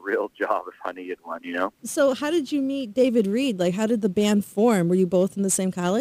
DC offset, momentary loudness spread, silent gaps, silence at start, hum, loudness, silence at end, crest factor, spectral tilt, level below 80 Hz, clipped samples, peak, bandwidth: under 0.1%; 11 LU; none; 0.05 s; none; -23 LUFS; 0 s; 16 dB; -5 dB/octave; -66 dBFS; under 0.1%; -8 dBFS; 15.5 kHz